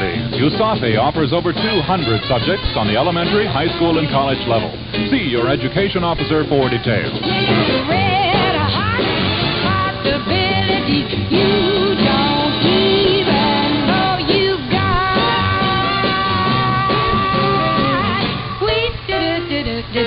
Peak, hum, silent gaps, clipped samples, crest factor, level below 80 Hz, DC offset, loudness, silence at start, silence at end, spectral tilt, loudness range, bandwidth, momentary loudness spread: 0 dBFS; none; none; under 0.1%; 16 dB; -34 dBFS; under 0.1%; -16 LUFS; 0 s; 0 s; -11.5 dB/octave; 2 LU; 5.6 kHz; 4 LU